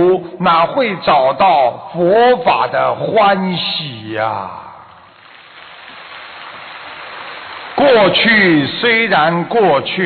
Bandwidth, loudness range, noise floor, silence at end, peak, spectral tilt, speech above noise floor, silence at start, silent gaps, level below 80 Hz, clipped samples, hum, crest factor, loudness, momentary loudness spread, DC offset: 4.9 kHz; 14 LU; -41 dBFS; 0 s; -2 dBFS; -9.5 dB/octave; 28 dB; 0 s; none; -54 dBFS; under 0.1%; none; 12 dB; -13 LUFS; 21 LU; under 0.1%